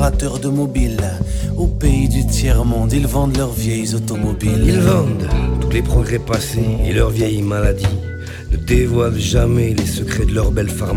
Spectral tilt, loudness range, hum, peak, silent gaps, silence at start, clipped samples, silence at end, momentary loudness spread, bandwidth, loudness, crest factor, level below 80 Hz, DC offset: -6 dB/octave; 1 LU; none; -2 dBFS; none; 0 s; under 0.1%; 0 s; 5 LU; 17 kHz; -17 LUFS; 14 dB; -20 dBFS; under 0.1%